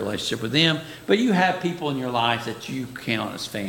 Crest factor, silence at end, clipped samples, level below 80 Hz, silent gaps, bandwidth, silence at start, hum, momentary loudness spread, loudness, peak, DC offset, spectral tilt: 20 dB; 0 s; under 0.1%; -58 dBFS; none; 17 kHz; 0 s; none; 11 LU; -23 LUFS; -4 dBFS; under 0.1%; -4.5 dB/octave